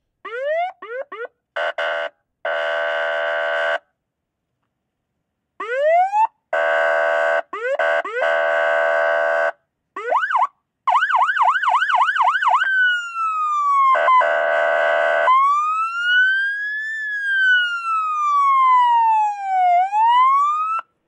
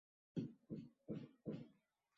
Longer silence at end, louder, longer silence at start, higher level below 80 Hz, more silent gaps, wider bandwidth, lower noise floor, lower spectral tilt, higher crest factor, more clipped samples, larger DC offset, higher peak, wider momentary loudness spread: second, 0.25 s vs 0.45 s; first, -18 LUFS vs -52 LUFS; about the same, 0.25 s vs 0.35 s; about the same, -86 dBFS vs -82 dBFS; neither; first, 10 kHz vs 7.4 kHz; about the same, -77 dBFS vs -78 dBFS; second, 1 dB/octave vs -9 dB/octave; second, 14 dB vs 22 dB; neither; neither; first, -6 dBFS vs -30 dBFS; first, 11 LU vs 5 LU